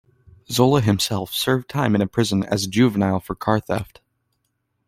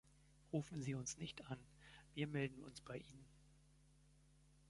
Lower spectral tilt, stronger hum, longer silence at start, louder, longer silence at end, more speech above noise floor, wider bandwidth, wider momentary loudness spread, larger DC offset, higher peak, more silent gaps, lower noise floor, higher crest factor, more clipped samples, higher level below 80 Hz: about the same, -5.5 dB/octave vs -5 dB/octave; neither; first, 0.5 s vs 0.05 s; first, -20 LUFS vs -49 LUFS; first, 1.05 s vs 0 s; first, 53 dB vs 23 dB; first, 16.5 kHz vs 11.5 kHz; second, 7 LU vs 19 LU; neither; first, -2 dBFS vs -30 dBFS; neither; about the same, -73 dBFS vs -71 dBFS; about the same, 18 dB vs 22 dB; neither; first, -52 dBFS vs -72 dBFS